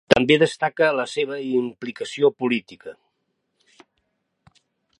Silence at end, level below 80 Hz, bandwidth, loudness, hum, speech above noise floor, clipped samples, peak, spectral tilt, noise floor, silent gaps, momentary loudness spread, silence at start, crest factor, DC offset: 2.05 s; -58 dBFS; 11 kHz; -21 LUFS; none; 53 dB; under 0.1%; 0 dBFS; -5 dB/octave; -74 dBFS; none; 16 LU; 0.1 s; 24 dB; under 0.1%